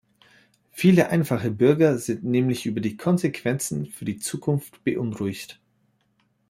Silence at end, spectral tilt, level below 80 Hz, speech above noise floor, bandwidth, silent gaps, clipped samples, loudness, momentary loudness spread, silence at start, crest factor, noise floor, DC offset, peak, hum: 1 s; -6.5 dB/octave; -62 dBFS; 45 dB; 16 kHz; none; under 0.1%; -23 LUFS; 12 LU; 0.75 s; 20 dB; -68 dBFS; under 0.1%; -4 dBFS; none